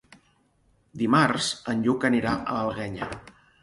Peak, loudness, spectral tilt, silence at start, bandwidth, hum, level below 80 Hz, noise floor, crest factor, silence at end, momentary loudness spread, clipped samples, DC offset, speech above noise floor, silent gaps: -6 dBFS; -25 LUFS; -5 dB/octave; 0.95 s; 11.5 kHz; none; -56 dBFS; -65 dBFS; 20 dB; 0.35 s; 14 LU; under 0.1%; under 0.1%; 40 dB; none